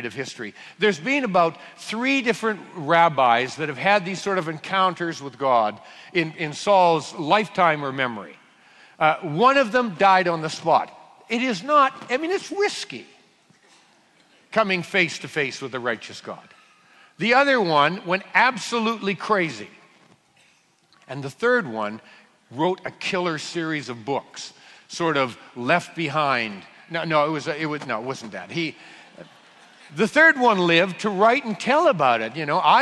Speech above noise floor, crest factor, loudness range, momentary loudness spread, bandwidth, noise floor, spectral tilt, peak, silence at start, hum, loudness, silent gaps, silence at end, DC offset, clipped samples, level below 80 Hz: 38 dB; 20 dB; 7 LU; 14 LU; 12 kHz; -60 dBFS; -4.5 dB/octave; -2 dBFS; 0 s; none; -21 LUFS; none; 0 s; under 0.1%; under 0.1%; -70 dBFS